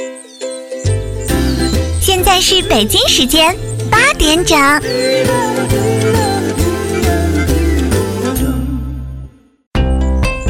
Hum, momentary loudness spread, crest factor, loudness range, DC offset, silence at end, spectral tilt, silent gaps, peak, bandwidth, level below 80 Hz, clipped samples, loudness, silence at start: none; 13 LU; 12 dB; 6 LU; under 0.1%; 0 s; -4 dB/octave; 9.67-9.71 s; 0 dBFS; 16.5 kHz; -22 dBFS; under 0.1%; -12 LUFS; 0 s